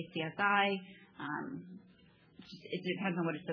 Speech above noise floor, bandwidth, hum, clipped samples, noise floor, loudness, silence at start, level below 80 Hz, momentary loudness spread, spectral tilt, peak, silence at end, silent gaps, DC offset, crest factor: 28 dB; 5.4 kHz; none; under 0.1%; -64 dBFS; -35 LUFS; 0 s; -80 dBFS; 23 LU; -7.5 dB/octave; -16 dBFS; 0 s; none; under 0.1%; 20 dB